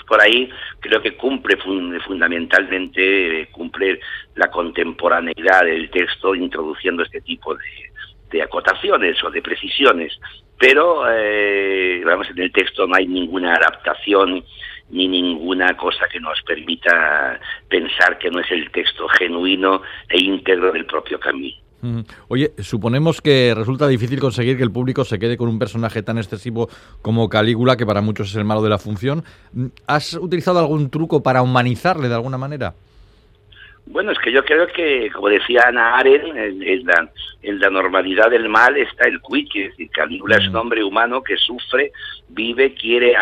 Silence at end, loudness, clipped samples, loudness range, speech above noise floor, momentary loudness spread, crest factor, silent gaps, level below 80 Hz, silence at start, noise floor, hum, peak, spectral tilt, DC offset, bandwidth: 0 s; -17 LUFS; under 0.1%; 4 LU; 32 dB; 12 LU; 18 dB; none; -50 dBFS; 0.1 s; -50 dBFS; none; 0 dBFS; -6 dB/octave; under 0.1%; 13.5 kHz